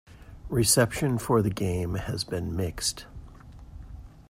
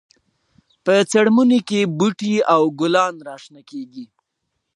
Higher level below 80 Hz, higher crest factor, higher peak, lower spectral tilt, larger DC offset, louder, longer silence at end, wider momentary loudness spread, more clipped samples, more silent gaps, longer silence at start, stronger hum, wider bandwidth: first, -46 dBFS vs -70 dBFS; about the same, 20 dB vs 18 dB; second, -8 dBFS vs -2 dBFS; about the same, -4.5 dB/octave vs -5 dB/octave; neither; second, -26 LUFS vs -17 LUFS; second, 0.1 s vs 0.7 s; first, 25 LU vs 21 LU; neither; neither; second, 0.1 s vs 0.85 s; neither; first, 16 kHz vs 11.5 kHz